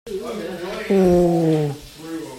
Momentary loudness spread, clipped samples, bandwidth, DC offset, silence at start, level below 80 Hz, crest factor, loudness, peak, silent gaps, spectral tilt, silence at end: 17 LU; under 0.1%; 16 kHz; under 0.1%; 0.05 s; -44 dBFS; 16 dB; -20 LUFS; -6 dBFS; none; -7.5 dB/octave; 0 s